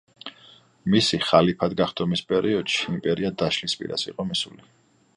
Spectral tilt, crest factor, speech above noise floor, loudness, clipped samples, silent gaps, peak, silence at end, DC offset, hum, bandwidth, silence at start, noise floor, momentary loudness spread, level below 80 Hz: -5 dB/octave; 22 dB; 29 dB; -23 LUFS; under 0.1%; none; -2 dBFS; 0.65 s; under 0.1%; none; 11 kHz; 0.25 s; -53 dBFS; 13 LU; -56 dBFS